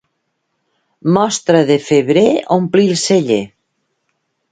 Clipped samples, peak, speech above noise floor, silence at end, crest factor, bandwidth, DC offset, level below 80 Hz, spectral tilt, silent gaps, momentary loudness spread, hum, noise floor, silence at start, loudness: under 0.1%; 0 dBFS; 57 dB; 1.05 s; 14 dB; 9.4 kHz; under 0.1%; -58 dBFS; -5 dB/octave; none; 6 LU; none; -69 dBFS; 1.05 s; -13 LUFS